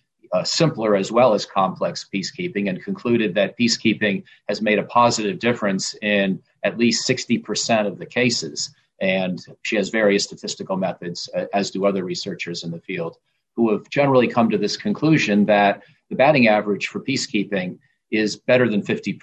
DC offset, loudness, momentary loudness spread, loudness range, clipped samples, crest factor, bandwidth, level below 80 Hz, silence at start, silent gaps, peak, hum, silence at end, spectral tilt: under 0.1%; -20 LUFS; 11 LU; 5 LU; under 0.1%; 16 dB; 8.8 kHz; -62 dBFS; 0.3 s; none; -4 dBFS; none; 0.05 s; -4.5 dB/octave